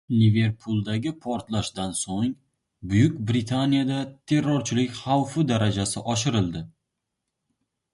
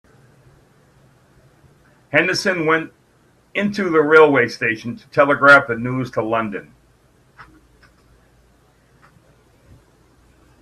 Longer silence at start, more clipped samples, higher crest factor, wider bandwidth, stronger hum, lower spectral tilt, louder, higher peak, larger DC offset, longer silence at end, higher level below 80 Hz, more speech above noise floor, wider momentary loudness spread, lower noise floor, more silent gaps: second, 0.1 s vs 2.15 s; neither; about the same, 18 dB vs 20 dB; about the same, 11.5 kHz vs 12.5 kHz; neither; about the same, -5.5 dB/octave vs -5.5 dB/octave; second, -25 LUFS vs -16 LUFS; second, -8 dBFS vs 0 dBFS; neither; second, 1.25 s vs 3.2 s; first, -50 dBFS vs -58 dBFS; first, 58 dB vs 40 dB; second, 8 LU vs 14 LU; first, -82 dBFS vs -56 dBFS; neither